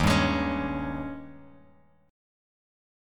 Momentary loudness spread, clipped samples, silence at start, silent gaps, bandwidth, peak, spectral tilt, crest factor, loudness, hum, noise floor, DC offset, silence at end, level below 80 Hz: 19 LU; under 0.1%; 0 s; none; 17.5 kHz; -10 dBFS; -5.5 dB/octave; 20 dB; -28 LUFS; none; -60 dBFS; under 0.1%; 1 s; -42 dBFS